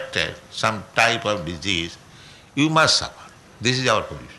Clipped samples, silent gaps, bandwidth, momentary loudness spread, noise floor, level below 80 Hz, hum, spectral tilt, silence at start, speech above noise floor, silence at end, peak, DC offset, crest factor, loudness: under 0.1%; none; 12 kHz; 10 LU; -46 dBFS; -50 dBFS; none; -3.5 dB/octave; 0 s; 24 dB; 0 s; -4 dBFS; under 0.1%; 18 dB; -21 LUFS